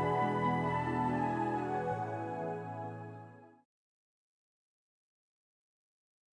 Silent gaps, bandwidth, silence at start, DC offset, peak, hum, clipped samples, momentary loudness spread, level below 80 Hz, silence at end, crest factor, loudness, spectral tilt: none; 10.5 kHz; 0 s; under 0.1%; -20 dBFS; none; under 0.1%; 15 LU; -64 dBFS; 2.85 s; 16 dB; -35 LUFS; -8 dB/octave